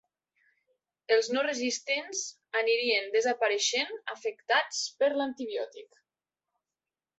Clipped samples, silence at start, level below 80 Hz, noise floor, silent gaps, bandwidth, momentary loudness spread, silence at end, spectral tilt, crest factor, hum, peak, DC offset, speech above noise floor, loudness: under 0.1%; 1.1 s; -84 dBFS; under -90 dBFS; none; 8.4 kHz; 9 LU; 1.35 s; 0 dB/octave; 20 dB; none; -12 dBFS; under 0.1%; over 60 dB; -29 LUFS